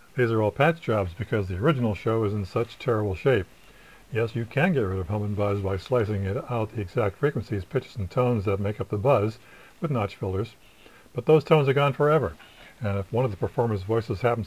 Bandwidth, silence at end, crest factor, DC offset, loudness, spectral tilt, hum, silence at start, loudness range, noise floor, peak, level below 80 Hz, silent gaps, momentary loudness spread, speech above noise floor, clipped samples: 16 kHz; 0 s; 20 dB; 0.2%; -26 LUFS; -8 dB/octave; none; 0.15 s; 3 LU; -53 dBFS; -6 dBFS; -46 dBFS; none; 8 LU; 28 dB; under 0.1%